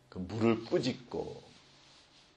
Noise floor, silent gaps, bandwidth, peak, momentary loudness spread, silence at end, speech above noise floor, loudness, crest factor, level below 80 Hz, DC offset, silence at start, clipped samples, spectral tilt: -61 dBFS; none; 9 kHz; -16 dBFS; 13 LU; 0.85 s; 28 dB; -34 LUFS; 20 dB; -66 dBFS; under 0.1%; 0.15 s; under 0.1%; -6.5 dB/octave